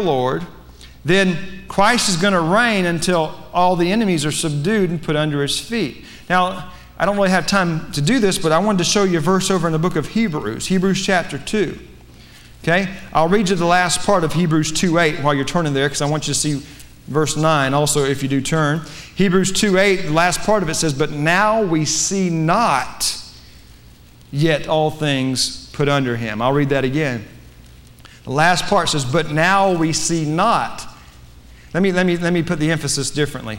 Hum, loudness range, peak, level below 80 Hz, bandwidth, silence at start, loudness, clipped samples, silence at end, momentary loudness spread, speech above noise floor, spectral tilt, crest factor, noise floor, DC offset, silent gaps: none; 3 LU; -2 dBFS; -40 dBFS; 16.5 kHz; 0 s; -17 LUFS; under 0.1%; 0 s; 7 LU; 27 dB; -4.5 dB/octave; 16 dB; -44 dBFS; under 0.1%; none